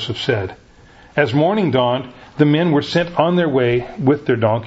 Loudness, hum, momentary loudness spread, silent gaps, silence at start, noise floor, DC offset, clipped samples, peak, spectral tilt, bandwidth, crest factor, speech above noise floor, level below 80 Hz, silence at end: -17 LUFS; none; 7 LU; none; 0 s; -45 dBFS; under 0.1%; under 0.1%; 0 dBFS; -7.5 dB/octave; 8 kHz; 18 dB; 29 dB; -50 dBFS; 0 s